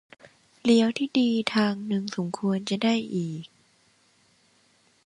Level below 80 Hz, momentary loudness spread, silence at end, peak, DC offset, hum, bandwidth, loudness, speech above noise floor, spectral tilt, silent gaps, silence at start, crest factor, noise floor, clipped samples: -70 dBFS; 10 LU; 1.6 s; -6 dBFS; under 0.1%; none; 11.5 kHz; -25 LUFS; 39 dB; -5.5 dB/octave; none; 0.65 s; 22 dB; -64 dBFS; under 0.1%